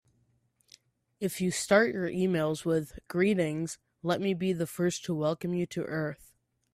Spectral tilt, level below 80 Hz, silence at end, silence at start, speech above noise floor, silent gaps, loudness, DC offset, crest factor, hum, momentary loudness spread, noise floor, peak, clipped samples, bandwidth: -5.5 dB/octave; -64 dBFS; 0.6 s; 1.2 s; 42 dB; none; -30 LUFS; under 0.1%; 20 dB; none; 11 LU; -71 dBFS; -10 dBFS; under 0.1%; 15.5 kHz